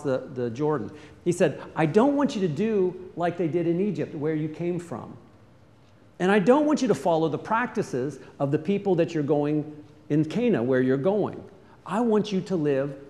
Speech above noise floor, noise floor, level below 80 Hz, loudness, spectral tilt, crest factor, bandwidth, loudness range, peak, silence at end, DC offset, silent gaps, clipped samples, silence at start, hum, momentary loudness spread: 30 dB; -55 dBFS; -66 dBFS; -25 LUFS; -7 dB/octave; 18 dB; 12 kHz; 3 LU; -6 dBFS; 0 s; under 0.1%; none; under 0.1%; 0 s; none; 10 LU